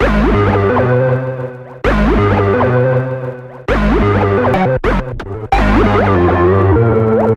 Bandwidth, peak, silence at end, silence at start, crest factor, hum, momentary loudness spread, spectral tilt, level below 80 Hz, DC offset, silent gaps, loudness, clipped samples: 7.8 kHz; 0 dBFS; 0 s; 0 s; 12 dB; none; 11 LU; -8.5 dB/octave; -22 dBFS; under 0.1%; none; -13 LUFS; under 0.1%